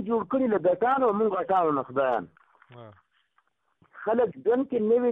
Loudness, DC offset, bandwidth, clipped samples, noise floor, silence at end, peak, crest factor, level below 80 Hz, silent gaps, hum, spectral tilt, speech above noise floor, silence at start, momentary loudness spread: -25 LUFS; under 0.1%; 3.9 kHz; under 0.1%; -71 dBFS; 0 s; -14 dBFS; 12 dB; -68 dBFS; none; none; -9.5 dB/octave; 46 dB; 0 s; 5 LU